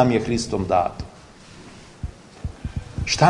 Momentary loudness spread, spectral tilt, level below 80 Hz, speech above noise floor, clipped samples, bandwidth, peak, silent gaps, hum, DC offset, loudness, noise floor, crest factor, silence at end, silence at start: 22 LU; -5 dB/octave; -40 dBFS; 24 dB; under 0.1%; 11 kHz; 0 dBFS; none; none; under 0.1%; -24 LUFS; -45 dBFS; 22 dB; 0 s; 0 s